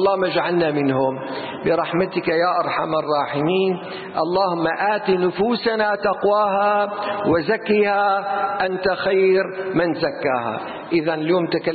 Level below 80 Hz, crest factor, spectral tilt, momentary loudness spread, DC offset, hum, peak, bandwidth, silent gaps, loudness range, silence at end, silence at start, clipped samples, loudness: -56 dBFS; 12 dB; -11 dB/octave; 5 LU; under 0.1%; none; -8 dBFS; 4.8 kHz; none; 2 LU; 0 s; 0 s; under 0.1%; -20 LUFS